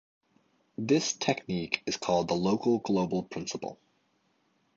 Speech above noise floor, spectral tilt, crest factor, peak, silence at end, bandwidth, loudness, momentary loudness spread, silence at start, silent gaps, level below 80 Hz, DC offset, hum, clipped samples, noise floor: 43 dB; -4.5 dB/octave; 22 dB; -8 dBFS; 1.05 s; 8 kHz; -30 LUFS; 11 LU; 0.8 s; none; -64 dBFS; under 0.1%; none; under 0.1%; -72 dBFS